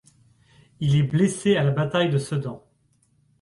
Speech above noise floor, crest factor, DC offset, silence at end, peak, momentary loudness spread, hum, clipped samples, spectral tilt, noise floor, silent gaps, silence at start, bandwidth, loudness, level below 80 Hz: 43 dB; 16 dB; under 0.1%; 0.85 s; -8 dBFS; 9 LU; none; under 0.1%; -6.5 dB/octave; -65 dBFS; none; 0.8 s; 11.5 kHz; -22 LUFS; -56 dBFS